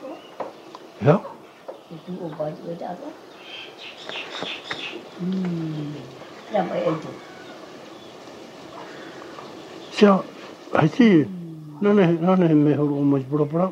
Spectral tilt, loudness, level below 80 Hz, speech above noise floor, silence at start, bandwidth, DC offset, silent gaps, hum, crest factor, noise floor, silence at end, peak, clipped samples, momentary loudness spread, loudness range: -7.5 dB/octave; -22 LUFS; -70 dBFS; 22 dB; 0 s; 9 kHz; under 0.1%; none; none; 22 dB; -42 dBFS; 0 s; -2 dBFS; under 0.1%; 23 LU; 13 LU